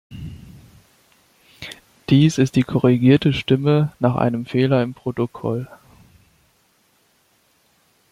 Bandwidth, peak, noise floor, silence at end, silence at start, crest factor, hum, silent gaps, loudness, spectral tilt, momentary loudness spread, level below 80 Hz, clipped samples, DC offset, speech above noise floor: 12.5 kHz; -2 dBFS; -61 dBFS; 2.45 s; 0.1 s; 20 dB; none; none; -18 LUFS; -7.5 dB/octave; 21 LU; -52 dBFS; under 0.1%; under 0.1%; 44 dB